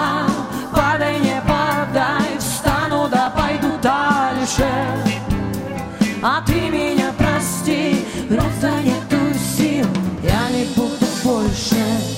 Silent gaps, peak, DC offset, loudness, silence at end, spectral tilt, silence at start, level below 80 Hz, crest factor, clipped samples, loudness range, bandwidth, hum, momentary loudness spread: none; 0 dBFS; under 0.1%; -18 LUFS; 0 s; -5 dB/octave; 0 s; -34 dBFS; 18 dB; under 0.1%; 1 LU; 16.5 kHz; none; 3 LU